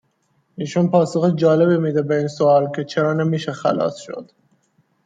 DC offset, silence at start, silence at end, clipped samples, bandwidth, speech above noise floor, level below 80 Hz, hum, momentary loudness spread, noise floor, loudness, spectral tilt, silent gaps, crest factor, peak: under 0.1%; 0.6 s; 0.8 s; under 0.1%; 9 kHz; 47 dB; -66 dBFS; none; 10 LU; -65 dBFS; -18 LUFS; -7.5 dB/octave; none; 16 dB; -2 dBFS